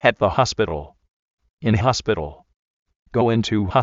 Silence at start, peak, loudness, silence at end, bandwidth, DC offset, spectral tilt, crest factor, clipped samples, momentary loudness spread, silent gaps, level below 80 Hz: 0.05 s; -2 dBFS; -21 LUFS; 0 s; 7.8 kHz; under 0.1%; -5 dB/octave; 20 dB; under 0.1%; 8 LU; 1.10-1.37 s, 1.50-1.57 s, 2.56-2.86 s, 2.96-3.03 s; -44 dBFS